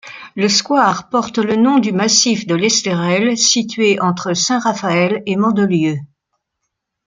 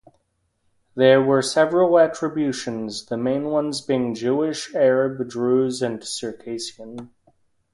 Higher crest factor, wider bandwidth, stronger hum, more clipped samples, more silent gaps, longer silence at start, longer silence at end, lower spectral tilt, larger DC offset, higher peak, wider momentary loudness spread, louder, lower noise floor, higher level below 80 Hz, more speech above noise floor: about the same, 16 dB vs 20 dB; second, 9.6 kHz vs 11.5 kHz; neither; neither; neither; second, 0.05 s vs 0.95 s; first, 1.05 s vs 0.7 s; second, -3.5 dB/octave vs -5 dB/octave; neither; about the same, 0 dBFS vs -2 dBFS; second, 5 LU vs 14 LU; first, -14 LUFS vs -21 LUFS; first, -75 dBFS vs -70 dBFS; about the same, -60 dBFS vs -64 dBFS; first, 60 dB vs 49 dB